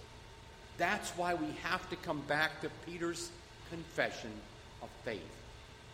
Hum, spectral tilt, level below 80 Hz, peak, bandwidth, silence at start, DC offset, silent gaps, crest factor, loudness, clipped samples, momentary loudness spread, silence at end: none; -4 dB/octave; -60 dBFS; -16 dBFS; 16 kHz; 0 s; under 0.1%; none; 24 dB; -38 LUFS; under 0.1%; 19 LU; 0 s